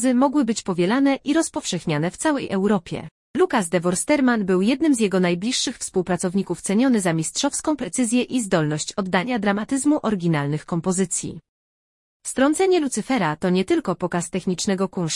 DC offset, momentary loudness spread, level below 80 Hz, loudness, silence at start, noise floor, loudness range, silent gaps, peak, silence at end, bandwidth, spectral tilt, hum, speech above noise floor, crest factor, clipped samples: under 0.1%; 6 LU; -56 dBFS; -21 LUFS; 0 s; under -90 dBFS; 2 LU; 3.11-3.34 s, 11.48-12.20 s; -4 dBFS; 0 s; 12 kHz; -4.5 dB/octave; none; over 69 dB; 16 dB; under 0.1%